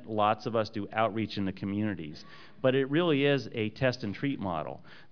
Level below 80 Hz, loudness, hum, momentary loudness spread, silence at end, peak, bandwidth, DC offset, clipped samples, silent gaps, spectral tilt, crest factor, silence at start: -66 dBFS; -30 LUFS; none; 14 LU; 0.1 s; -12 dBFS; 5.4 kHz; 0.3%; under 0.1%; none; -7 dB/octave; 18 dB; 0 s